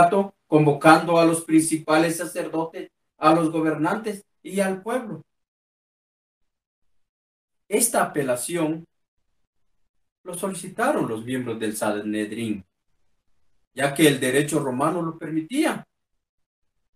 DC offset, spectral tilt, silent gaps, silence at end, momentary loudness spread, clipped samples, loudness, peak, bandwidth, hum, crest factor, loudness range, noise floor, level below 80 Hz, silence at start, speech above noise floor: under 0.1%; -4.5 dB/octave; 5.48-6.41 s, 6.67-6.82 s, 7.09-7.48 s, 9.08-9.17 s, 9.47-9.53 s, 9.89-9.94 s, 10.12-10.24 s, 13.67-13.71 s; 1.15 s; 13 LU; under 0.1%; -22 LUFS; 0 dBFS; 15.5 kHz; none; 24 dB; 9 LU; -70 dBFS; -68 dBFS; 0 s; 48 dB